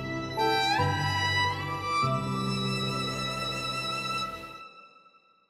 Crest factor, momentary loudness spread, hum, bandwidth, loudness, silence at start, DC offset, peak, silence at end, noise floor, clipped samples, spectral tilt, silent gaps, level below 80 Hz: 16 dB; 9 LU; none; 15.5 kHz; -28 LUFS; 0 s; under 0.1%; -14 dBFS; 0.6 s; -61 dBFS; under 0.1%; -4.5 dB/octave; none; -56 dBFS